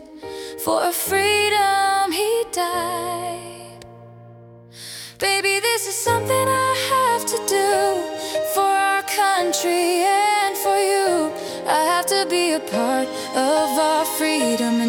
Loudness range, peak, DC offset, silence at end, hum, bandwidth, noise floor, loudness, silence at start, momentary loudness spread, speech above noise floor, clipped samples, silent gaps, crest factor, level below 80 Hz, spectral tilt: 5 LU; -4 dBFS; under 0.1%; 0 s; none; 18 kHz; -43 dBFS; -19 LUFS; 0 s; 10 LU; 24 dB; under 0.1%; none; 16 dB; -62 dBFS; -2.5 dB/octave